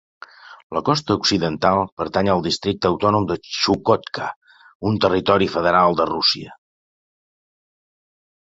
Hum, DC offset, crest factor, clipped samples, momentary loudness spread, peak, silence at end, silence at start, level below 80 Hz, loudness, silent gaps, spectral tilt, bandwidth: none; under 0.1%; 20 dB; under 0.1%; 10 LU; -2 dBFS; 1.9 s; 0.45 s; -48 dBFS; -19 LUFS; 0.63-0.70 s, 1.92-1.97 s, 4.36-4.41 s, 4.75-4.80 s; -5 dB/octave; 8 kHz